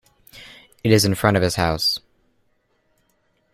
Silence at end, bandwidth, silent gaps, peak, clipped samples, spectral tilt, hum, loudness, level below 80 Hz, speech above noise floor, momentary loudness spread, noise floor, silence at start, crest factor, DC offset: 1.55 s; 16 kHz; none; -2 dBFS; under 0.1%; -4.5 dB/octave; none; -19 LUFS; -46 dBFS; 48 dB; 17 LU; -66 dBFS; 0.35 s; 20 dB; under 0.1%